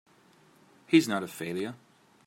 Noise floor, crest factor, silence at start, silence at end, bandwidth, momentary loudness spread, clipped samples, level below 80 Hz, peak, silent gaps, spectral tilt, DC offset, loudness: -61 dBFS; 24 dB; 0.9 s; 0.5 s; 16 kHz; 12 LU; under 0.1%; -78 dBFS; -8 dBFS; none; -5 dB/octave; under 0.1%; -28 LUFS